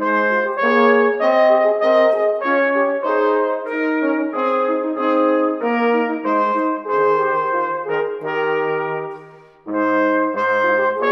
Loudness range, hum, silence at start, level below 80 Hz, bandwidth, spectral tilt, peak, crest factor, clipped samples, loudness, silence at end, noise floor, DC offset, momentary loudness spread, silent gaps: 5 LU; none; 0 s; -68 dBFS; 6.2 kHz; -6.5 dB/octave; -2 dBFS; 16 dB; under 0.1%; -17 LUFS; 0 s; -42 dBFS; under 0.1%; 7 LU; none